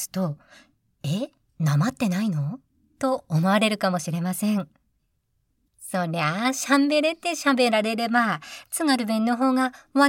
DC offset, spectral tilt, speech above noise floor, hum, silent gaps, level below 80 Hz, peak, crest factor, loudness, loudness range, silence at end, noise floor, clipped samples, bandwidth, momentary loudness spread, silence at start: under 0.1%; -5 dB/octave; 49 dB; none; none; -68 dBFS; -6 dBFS; 18 dB; -24 LUFS; 4 LU; 0 s; -72 dBFS; under 0.1%; 17 kHz; 11 LU; 0 s